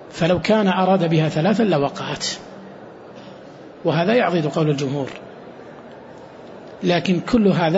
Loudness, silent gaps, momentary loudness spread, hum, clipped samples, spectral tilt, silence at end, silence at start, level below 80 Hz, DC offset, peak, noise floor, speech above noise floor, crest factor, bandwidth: -19 LUFS; none; 23 LU; none; under 0.1%; -6 dB/octave; 0 s; 0 s; -52 dBFS; under 0.1%; -4 dBFS; -40 dBFS; 22 dB; 16 dB; 8 kHz